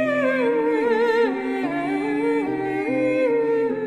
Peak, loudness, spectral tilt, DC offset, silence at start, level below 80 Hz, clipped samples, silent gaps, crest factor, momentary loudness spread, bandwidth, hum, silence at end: -10 dBFS; -22 LUFS; -6.5 dB/octave; under 0.1%; 0 s; -62 dBFS; under 0.1%; none; 12 dB; 5 LU; 11 kHz; none; 0 s